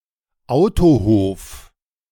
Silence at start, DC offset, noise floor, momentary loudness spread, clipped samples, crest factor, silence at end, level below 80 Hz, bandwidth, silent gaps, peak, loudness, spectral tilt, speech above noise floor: 0.5 s; under 0.1%; -51 dBFS; 17 LU; under 0.1%; 14 dB; 0.5 s; -32 dBFS; 17.5 kHz; none; -2 dBFS; -16 LUFS; -8 dB/octave; 36 dB